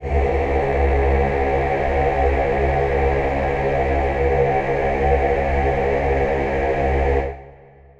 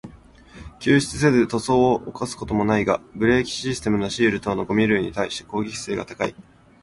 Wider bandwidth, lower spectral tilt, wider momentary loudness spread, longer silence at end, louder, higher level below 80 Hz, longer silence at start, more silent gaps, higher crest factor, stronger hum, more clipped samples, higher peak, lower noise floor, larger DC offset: second, 7.4 kHz vs 11.5 kHz; first, -8 dB/octave vs -5.5 dB/octave; second, 2 LU vs 10 LU; about the same, 0.5 s vs 0.4 s; first, -19 LUFS vs -22 LUFS; first, -24 dBFS vs -46 dBFS; about the same, 0 s vs 0.05 s; neither; about the same, 14 dB vs 18 dB; neither; neither; about the same, -6 dBFS vs -4 dBFS; about the same, -45 dBFS vs -47 dBFS; neither